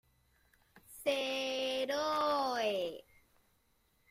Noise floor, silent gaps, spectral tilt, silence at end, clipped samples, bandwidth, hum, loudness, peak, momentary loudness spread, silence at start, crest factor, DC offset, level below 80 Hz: -74 dBFS; none; -2.5 dB/octave; 1.1 s; under 0.1%; 16 kHz; none; -35 LUFS; -20 dBFS; 9 LU; 0.75 s; 18 dB; under 0.1%; -74 dBFS